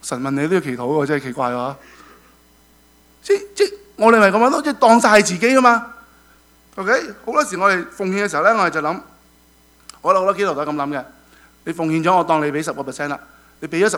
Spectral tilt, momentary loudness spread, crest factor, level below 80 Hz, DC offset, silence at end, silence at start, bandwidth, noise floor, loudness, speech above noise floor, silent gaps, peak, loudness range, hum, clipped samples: -4.5 dB/octave; 14 LU; 18 dB; -58 dBFS; under 0.1%; 0 s; 0.05 s; over 20 kHz; -52 dBFS; -17 LUFS; 35 dB; none; 0 dBFS; 8 LU; none; under 0.1%